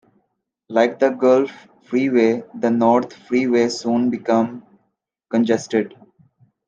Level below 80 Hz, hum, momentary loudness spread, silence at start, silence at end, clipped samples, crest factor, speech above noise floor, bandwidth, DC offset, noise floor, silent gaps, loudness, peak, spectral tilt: -66 dBFS; none; 8 LU; 0.7 s; 0.8 s; under 0.1%; 18 dB; 55 dB; 7.8 kHz; under 0.1%; -72 dBFS; none; -19 LUFS; -2 dBFS; -5.5 dB/octave